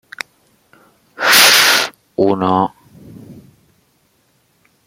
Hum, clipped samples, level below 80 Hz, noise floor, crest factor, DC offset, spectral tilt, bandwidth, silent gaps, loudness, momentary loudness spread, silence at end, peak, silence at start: none; under 0.1%; -62 dBFS; -59 dBFS; 18 dB; under 0.1%; -1.5 dB/octave; over 20 kHz; none; -11 LUFS; 23 LU; 1.55 s; 0 dBFS; 1.2 s